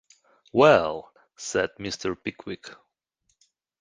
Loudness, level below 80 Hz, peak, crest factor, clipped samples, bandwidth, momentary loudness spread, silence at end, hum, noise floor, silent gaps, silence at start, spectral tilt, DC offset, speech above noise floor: -24 LUFS; -58 dBFS; -4 dBFS; 24 dB; under 0.1%; 10 kHz; 20 LU; 1.05 s; none; -74 dBFS; none; 0.55 s; -4.5 dB/octave; under 0.1%; 51 dB